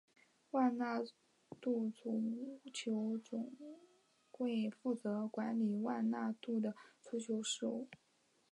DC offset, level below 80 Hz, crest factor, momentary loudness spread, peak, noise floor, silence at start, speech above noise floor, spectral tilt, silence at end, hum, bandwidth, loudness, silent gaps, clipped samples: under 0.1%; under -90 dBFS; 18 dB; 10 LU; -22 dBFS; -66 dBFS; 0.55 s; 26 dB; -5 dB/octave; 0.6 s; none; 11 kHz; -40 LUFS; none; under 0.1%